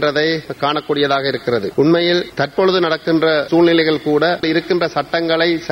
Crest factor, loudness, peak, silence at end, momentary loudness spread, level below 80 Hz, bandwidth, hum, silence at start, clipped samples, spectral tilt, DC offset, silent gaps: 14 dB; -16 LUFS; -2 dBFS; 0 s; 6 LU; -52 dBFS; 10.5 kHz; none; 0 s; under 0.1%; -6 dB/octave; under 0.1%; none